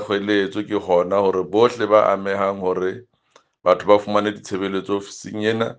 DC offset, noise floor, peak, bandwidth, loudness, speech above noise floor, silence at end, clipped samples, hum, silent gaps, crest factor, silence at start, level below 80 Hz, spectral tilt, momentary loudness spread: under 0.1%; -58 dBFS; 0 dBFS; 9.2 kHz; -20 LUFS; 38 dB; 0.05 s; under 0.1%; none; none; 20 dB; 0 s; -66 dBFS; -5.5 dB/octave; 10 LU